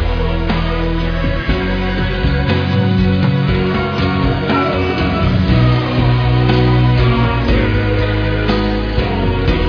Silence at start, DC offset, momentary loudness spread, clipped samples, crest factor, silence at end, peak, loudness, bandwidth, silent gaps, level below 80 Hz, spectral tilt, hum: 0 s; under 0.1%; 5 LU; under 0.1%; 12 dB; 0 s; 0 dBFS; -15 LUFS; 5.4 kHz; none; -20 dBFS; -8.5 dB/octave; none